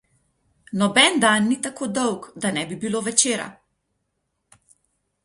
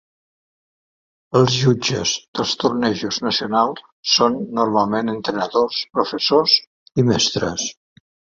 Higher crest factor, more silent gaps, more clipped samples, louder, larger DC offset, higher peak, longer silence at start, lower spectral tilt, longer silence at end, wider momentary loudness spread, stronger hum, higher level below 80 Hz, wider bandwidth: about the same, 22 dB vs 18 dB; second, none vs 2.28-2.33 s, 3.92-4.03 s, 6.67-6.86 s; neither; about the same, -20 LUFS vs -19 LUFS; neither; about the same, -2 dBFS vs -2 dBFS; second, 0.7 s vs 1.3 s; second, -2.5 dB/octave vs -4 dB/octave; first, 1.75 s vs 0.65 s; first, 12 LU vs 7 LU; neither; second, -64 dBFS vs -54 dBFS; first, 11.5 kHz vs 7.8 kHz